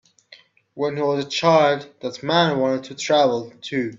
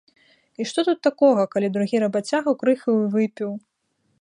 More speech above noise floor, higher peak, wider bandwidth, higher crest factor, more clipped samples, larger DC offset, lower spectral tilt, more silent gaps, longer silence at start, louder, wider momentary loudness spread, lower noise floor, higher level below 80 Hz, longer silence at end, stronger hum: second, 31 dB vs 49 dB; about the same, -4 dBFS vs -4 dBFS; second, 7.8 kHz vs 11 kHz; about the same, 18 dB vs 18 dB; neither; neither; about the same, -5 dB/octave vs -6 dB/octave; neither; second, 0.3 s vs 0.6 s; about the same, -20 LUFS vs -22 LUFS; about the same, 11 LU vs 12 LU; second, -51 dBFS vs -70 dBFS; first, -64 dBFS vs -74 dBFS; second, 0 s vs 0.65 s; neither